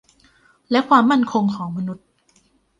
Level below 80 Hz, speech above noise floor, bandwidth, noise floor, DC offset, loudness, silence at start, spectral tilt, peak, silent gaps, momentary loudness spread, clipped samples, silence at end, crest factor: -62 dBFS; 42 dB; 9.4 kHz; -60 dBFS; under 0.1%; -19 LUFS; 0.7 s; -6.5 dB/octave; -2 dBFS; none; 15 LU; under 0.1%; 0.85 s; 20 dB